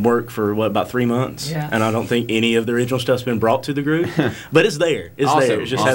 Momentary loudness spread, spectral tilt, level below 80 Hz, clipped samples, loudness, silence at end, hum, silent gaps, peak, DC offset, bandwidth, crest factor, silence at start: 5 LU; -5.5 dB/octave; -52 dBFS; under 0.1%; -19 LUFS; 0 s; none; none; -2 dBFS; under 0.1%; 17 kHz; 16 dB; 0 s